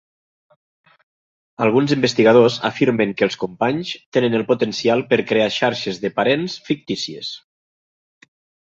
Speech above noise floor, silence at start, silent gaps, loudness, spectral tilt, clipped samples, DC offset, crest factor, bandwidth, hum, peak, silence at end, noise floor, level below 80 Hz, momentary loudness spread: over 72 dB; 1.6 s; 4.06-4.12 s; -18 LUFS; -5.5 dB/octave; under 0.1%; under 0.1%; 18 dB; 7.8 kHz; none; -2 dBFS; 1.3 s; under -90 dBFS; -62 dBFS; 11 LU